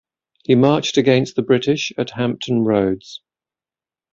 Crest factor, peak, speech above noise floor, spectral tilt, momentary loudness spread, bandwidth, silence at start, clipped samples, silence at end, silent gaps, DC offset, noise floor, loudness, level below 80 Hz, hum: 18 dB; -2 dBFS; over 73 dB; -6 dB/octave; 13 LU; 7.6 kHz; 0.5 s; under 0.1%; 0.95 s; none; under 0.1%; under -90 dBFS; -18 LUFS; -54 dBFS; none